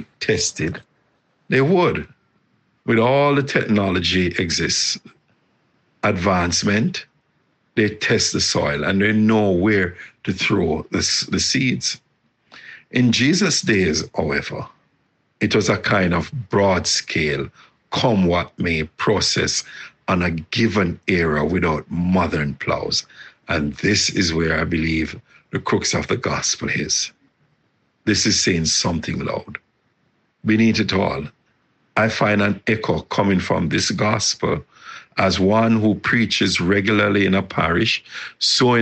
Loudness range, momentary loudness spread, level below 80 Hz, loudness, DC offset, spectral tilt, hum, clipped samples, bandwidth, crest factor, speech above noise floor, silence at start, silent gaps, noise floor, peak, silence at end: 3 LU; 11 LU; -44 dBFS; -19 LUFS; under 0.1%; -4 dB/octave; none; under 0.1%; 9 kHz; 18 dB; 46 dB; 0 s; none; -65 dBFS; -2 dBFS; 0 s